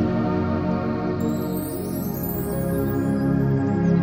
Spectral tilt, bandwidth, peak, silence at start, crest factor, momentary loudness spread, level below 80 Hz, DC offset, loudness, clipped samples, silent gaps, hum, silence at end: -8 dB/octave; 16.5 kHz; -8 dBFS; 0 s; 14 dB; 6 LU; -42 dBFS; under 0.1%; -24 LUFS; under 0.1%; none; none; 0 s